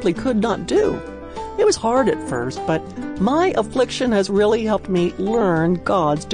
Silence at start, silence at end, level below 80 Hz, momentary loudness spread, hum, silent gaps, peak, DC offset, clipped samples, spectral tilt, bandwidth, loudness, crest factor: 0 s; 0 s; -42 dBFS; 7 LU; none; none; -6 dBFS; under 0.1%; under 0.1%; -5.5 dB/octave; 10.5 kHz; -19 LUFS; 12 dB